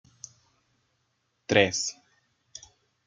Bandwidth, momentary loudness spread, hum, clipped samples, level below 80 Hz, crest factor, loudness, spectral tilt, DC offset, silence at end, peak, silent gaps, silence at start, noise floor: 9.6 kHz; 24 LU; none; under 0.1%; -68 dBFS; 28 dB; -25 LUFS; -3 dB/octave; under 0.1%; 0.5 s; -4 dBFS; none; 1.5 s; -75 dBFS